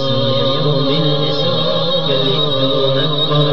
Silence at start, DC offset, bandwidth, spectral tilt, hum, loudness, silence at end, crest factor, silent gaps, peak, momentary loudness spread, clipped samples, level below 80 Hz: 0 s; 8%; 6.6 kHz; -7 dB/octave; none; -15 LUFS; 0 s; 14 dB; none; -2 dBFS; 1 LU; under 0.1%; -48 dBFS